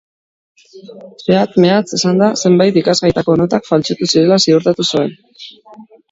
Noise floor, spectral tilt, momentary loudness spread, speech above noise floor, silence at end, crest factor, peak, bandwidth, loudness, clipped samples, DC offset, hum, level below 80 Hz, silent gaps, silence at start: under -90 dBFS; -5 dB/octave; 10 LU; over 77 dB; 0.3 s; 14 dB; 0 dBFS; 7.8 kHz; -13 LUFS; under 0.1%; under 0.1%; none; -48 dBFS; none; 0.75 s